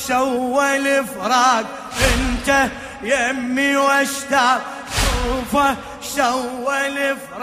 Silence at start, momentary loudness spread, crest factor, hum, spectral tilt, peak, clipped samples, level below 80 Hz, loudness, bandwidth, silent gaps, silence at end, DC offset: 0 s; 7 LU; 16 dB; none; -3 dB/octave; -2 dBFS; under 0.1%; -32 dBFS; -18 LUFS; 15.5 kHz; none; 0 s; under 0.1%